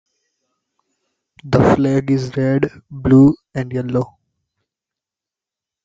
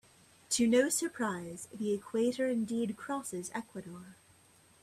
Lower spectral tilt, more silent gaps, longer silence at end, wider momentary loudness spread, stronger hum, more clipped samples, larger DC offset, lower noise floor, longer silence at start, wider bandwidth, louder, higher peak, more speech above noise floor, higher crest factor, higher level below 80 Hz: first, -8.5 dB/octave vs -3.5 dB/octave; neither; first, 1.8 s vs 0.7 s; second, 13 LU vs 17 LU; neither; neither; neither; first, -88 dBFS vs -64 dBFS; first, 1.45 s vs 0.5 s; second, 7.6 kHz vs 15 kHz; first, -16 LUFS vs -33 LUFS; first, -2 dBFS vs -16 dBFS; first, 72 dB vs 30 dB; about the same, 16 dB vs 20 dB; first, -44 dBFS vs -72 dBFS